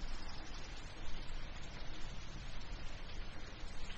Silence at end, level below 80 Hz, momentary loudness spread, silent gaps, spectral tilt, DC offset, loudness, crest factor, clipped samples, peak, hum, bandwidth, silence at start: 0 s; -46 dBFS; 1 LU; none; -4 dB/octave; under 0.1%; -50 LUFS; 14 dB; under 0.1%; -28 dBFS; none; 8.2 kHz; 0 s